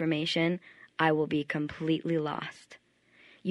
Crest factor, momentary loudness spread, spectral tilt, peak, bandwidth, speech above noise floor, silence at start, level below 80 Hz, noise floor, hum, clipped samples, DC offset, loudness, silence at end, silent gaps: 20 dB; 11 LU; -6.5 dB/octave; -10 dBFS; 11 kHz; 32 dB; 0 s; -70 dBFS; -62 dBFS; none; under 0.1%; under 0.1%; -30 LUFS; 0 s; none